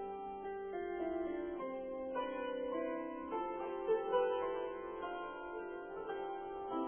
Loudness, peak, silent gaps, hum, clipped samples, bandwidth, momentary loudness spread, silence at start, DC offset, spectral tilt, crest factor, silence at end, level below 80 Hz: -41 LUFS; -22 dBFS; none; none; under 0.1%; 3.3 kHz; 9 LU; 0 s; under 0.1%; 0 dB/octave; 18 dB; 0 s; -68 dBFS